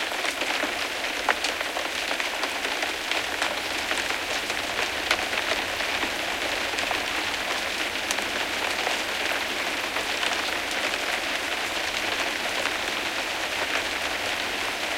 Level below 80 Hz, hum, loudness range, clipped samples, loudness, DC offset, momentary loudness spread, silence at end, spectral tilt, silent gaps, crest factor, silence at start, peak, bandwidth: -54 dBFS; none; 1 LU; under 0.1%; -26 LUFS; under 0.1%; 2 LU; 0 s; -0.5 dB/octave; none; 24 dB; 0 s; -4 dBFS; 17 kHz